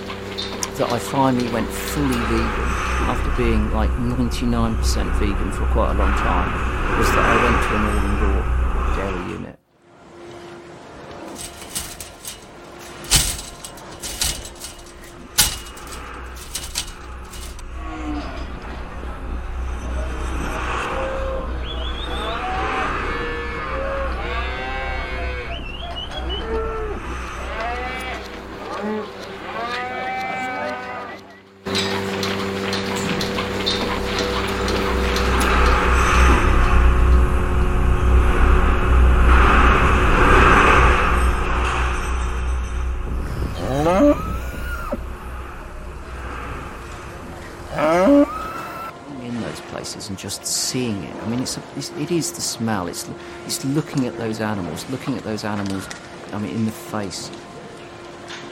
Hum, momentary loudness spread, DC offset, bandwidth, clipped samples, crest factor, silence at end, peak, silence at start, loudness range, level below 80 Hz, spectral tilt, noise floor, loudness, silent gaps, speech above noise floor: none; 18 LU; under 0.1%; 17 kHz; under 0.1%; 20 dB; 0 s; 0 dBFS; 0 s; 11 LU; -24 dBFS; -4.5 dB/octave; -50 dBFS; -21 LUFS; none; 29 dB